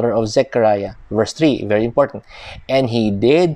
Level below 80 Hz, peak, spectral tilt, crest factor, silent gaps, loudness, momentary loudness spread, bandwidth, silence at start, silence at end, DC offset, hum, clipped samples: -44 dBFS; -2 dBFS; -6 dB/octave; 14 dB; none; -17 LUFS; 8 LU; 10.5 kHz; 0 s; 0 s; under 0.1%; none; under 0.1%